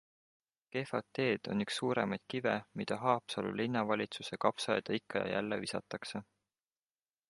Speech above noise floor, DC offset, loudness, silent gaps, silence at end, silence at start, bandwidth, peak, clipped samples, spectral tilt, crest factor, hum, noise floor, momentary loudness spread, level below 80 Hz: over 54 dB; under 0.1%; -36 LUFS; none; 1.05 s; 0.75 s; 11.5 kHz; -12 dBFS; under 0.1%; -5 dB/octave; 24 dB; none; under -90 dBFS; 8 LU; -74 dBFS